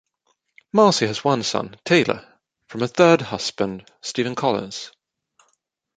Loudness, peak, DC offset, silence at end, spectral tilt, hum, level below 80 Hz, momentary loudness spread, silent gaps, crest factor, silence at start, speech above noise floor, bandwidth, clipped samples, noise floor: -20 LUFS; -2 dBFS; under 0.1%; 1.1 s; -4.5 dB/octave; none; -60 dBFS; 16 LU; none; 20 dB; 0.75 s; 50 dB; 9.4 kHz; under 0.1%; -70 dBFS